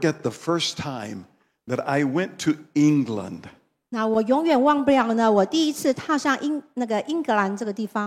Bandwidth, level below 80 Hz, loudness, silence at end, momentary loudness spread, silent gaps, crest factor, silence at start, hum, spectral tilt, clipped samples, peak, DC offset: 15 kHz; -66 dBFS; -23 LUFS; 0 s; 12 LU; none; 18 dB; 0 s; none; -5 dB/octave; under 0.1%; -6 dBFS; under 0.1%